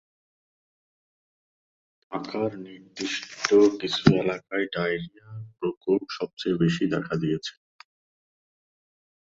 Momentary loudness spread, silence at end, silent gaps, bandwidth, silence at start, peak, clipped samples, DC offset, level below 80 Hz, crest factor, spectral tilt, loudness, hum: 17 LU; 1.85 s; 5.77-5.81 s, 6.33-6.37 s; 7.8 kHz; 2.1 s; -2 dBFS; under 0.1%; under 0.1%; -60 dBFS; 26 dB; -5.5 dB/octave; -26 LUFS; none